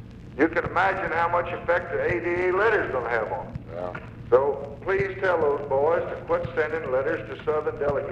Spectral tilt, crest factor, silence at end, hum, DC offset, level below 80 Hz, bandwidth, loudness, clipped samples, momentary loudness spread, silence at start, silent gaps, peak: -7.5 dB/octave; 18 dB; 0 s; none; under 0.1%; -48 dBFS; 7.8 kHz; -25 LUFS; under 0.1%; 10 LU; 0 s; none; -8 dBFS